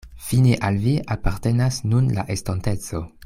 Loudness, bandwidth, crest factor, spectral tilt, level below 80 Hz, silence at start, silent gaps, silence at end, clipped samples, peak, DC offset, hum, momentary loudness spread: -22 LUFS; 16 kHz; 16 dB; -6.5 dB/octave; -36 dBFS; 0.05 s; none; 0.2 s; under 0.1%; -4 dBFS; under 0.1%; none; 8 LU